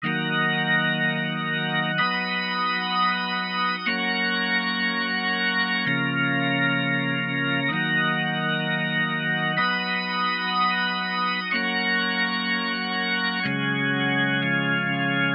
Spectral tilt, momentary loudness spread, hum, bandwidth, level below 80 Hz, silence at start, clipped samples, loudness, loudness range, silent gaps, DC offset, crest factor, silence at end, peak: -7.5 dB/octave; 3 LU; none; 5.4 kHz; -70 dBFS; 0 s; under 0.1%; -23 LUFS; 1 LU; none; under 0.1%; 14 dB; 0 s; -10 dBFS